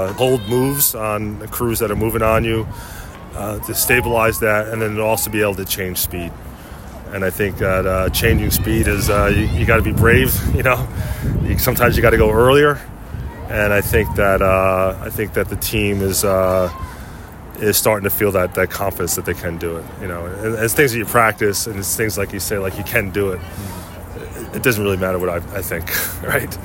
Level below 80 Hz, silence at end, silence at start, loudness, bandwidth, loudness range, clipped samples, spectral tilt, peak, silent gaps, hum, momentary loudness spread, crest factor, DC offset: -30 dBFS; 0 s; 0 s; -17 LUFS; 17 kHz; 6 LU; under 0.1%; -4.5 dB/octave; 0 dBFS; none; none; 16 LU; 18 dB; under 0.1%